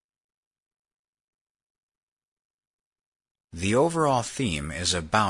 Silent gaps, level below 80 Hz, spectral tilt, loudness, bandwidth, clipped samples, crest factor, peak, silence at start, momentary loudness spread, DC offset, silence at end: none; -52 dBFS; -4 dB/octave; -25 LUFS; 11 kHz; under 0.1%; 24 dB; -6 dBFS; 3.55 s; 7 LU; under 0.1%; 0 s